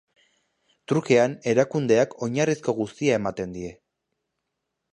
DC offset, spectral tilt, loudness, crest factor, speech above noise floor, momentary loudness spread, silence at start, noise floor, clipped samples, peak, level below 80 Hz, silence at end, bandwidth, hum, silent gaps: under 0.1%; -6 dB/octave; -23 LUFS; 20 dB; 58 dB; 12 LU; 0.9 s; -81 dBFS; under 0.1%; -4 dBFS; -60 dBFS; 1.2 s; 10.5 kHz; none; none